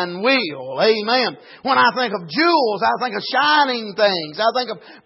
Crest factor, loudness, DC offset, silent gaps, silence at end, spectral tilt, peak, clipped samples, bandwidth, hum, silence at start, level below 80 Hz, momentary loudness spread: 16 dB; -18 LUFS; under 0.1%; none; 0.1 s; -6.5 dB/octave; -4 dBFS; under 0.1%; 6 kHz; none; 0 s; -76 dBFS; 8 LU